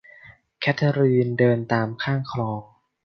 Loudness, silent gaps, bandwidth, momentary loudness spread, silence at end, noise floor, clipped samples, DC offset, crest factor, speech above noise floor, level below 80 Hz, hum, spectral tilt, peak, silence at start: -22 LUFS; none; 6.4 kHz; 9 LU; 0.4 s; -50 dBFS; under 0.1%; under 0.1%; 18 dB; 28 dB; -60 dBFS; none; -8 dB/octave; -4 dBFS; 0.25 s